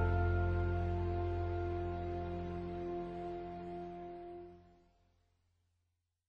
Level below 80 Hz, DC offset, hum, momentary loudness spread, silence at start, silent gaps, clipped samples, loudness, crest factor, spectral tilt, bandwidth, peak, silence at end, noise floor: -48 dBFS; under 0.1%; none; 14 LU; 0 s; none; under 0.1%; -39 LUFS; 16 dB; -10 dB/octave; 5 kHz; -22 dBFS; 1.65 s; -84 dBFS